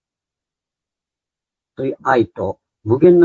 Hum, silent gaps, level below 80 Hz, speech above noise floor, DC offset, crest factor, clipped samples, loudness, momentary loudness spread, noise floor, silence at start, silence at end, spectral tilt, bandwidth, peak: none; none; -56 dBFS; 74 dB; under 0.1%; 18 dB; under 0.1%; -18 LUFS; 13 LU; -88 dBFS; 1.8 s; 0 s; -9 dB/octave; 7 kHz; 0 dBFS